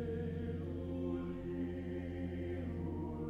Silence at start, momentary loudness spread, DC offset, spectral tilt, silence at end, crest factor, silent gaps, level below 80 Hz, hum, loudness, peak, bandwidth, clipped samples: 0 s; 2 LU; under 0.1%; -9.5 dB/octave; 0 s; 12 dB; none; -54 dBFS; none; -42 LUFS; -28 dBFS; 5 kHz; under 0.1%